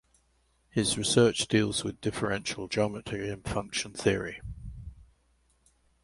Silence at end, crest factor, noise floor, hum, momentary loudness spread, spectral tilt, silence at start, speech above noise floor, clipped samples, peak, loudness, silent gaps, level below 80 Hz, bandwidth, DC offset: 1 s; 22 dB; -69 dBFS; none; 19 LU; -4 dB/octave; 0.75 s; 41 dB; under 0.1%; -8 dBFS; -29 LUFS; none; -52 dBFS; 11.5 kHz; under 0.1%